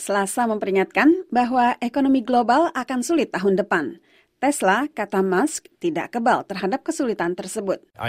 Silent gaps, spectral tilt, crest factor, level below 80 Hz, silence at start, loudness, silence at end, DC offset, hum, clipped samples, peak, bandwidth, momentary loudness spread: none; -4.5 dB/octave; 16 dB; -62 dBFS; 0 s; -21 LUFS; 0 s; under 0.1%; none; under 0.1%; -4 dBFS; 16 kHz; 8 LU